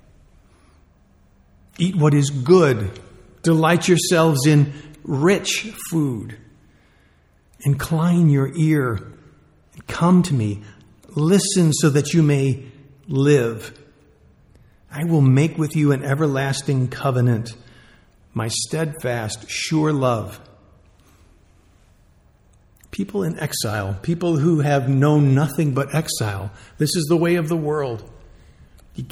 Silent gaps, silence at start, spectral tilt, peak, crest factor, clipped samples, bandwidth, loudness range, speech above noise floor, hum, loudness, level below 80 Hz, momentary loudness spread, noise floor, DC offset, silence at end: none; 1.8 s; -6 dB/octave; -2 dBFS; 18 dB; under 0.1%; 15.5 kHz; 7 LU; 38 dB; none; -19 LUFS; -52 dBFS; 14 LU; -56 dBFS; under 0.1%; 0 s